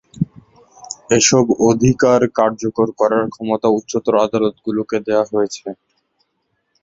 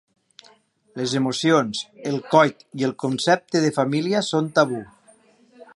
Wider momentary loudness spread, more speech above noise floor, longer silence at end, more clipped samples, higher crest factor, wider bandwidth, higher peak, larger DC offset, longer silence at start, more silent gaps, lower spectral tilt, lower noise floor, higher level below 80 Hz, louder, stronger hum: about the same, 12 LU vs 10 LU; first, 53 dB vs 36 dB; first, 1.1 s vs 0.1 s; neither; second, 16 dB vs 22 dB; second, 7.8 kHz vs 11.5 kHz; about the same, 0 dBFS vs -2 dBFS; neither; second, 0.15 s vs 0.95 s; neither; about the same, -4.5 dB/octave vs -5 dB/octave; first, -69 dBFS vs -57 dBFS; first, -48 dBFS vs -68 dBFS; first, -16 LUFS vs -21 LUFS; neither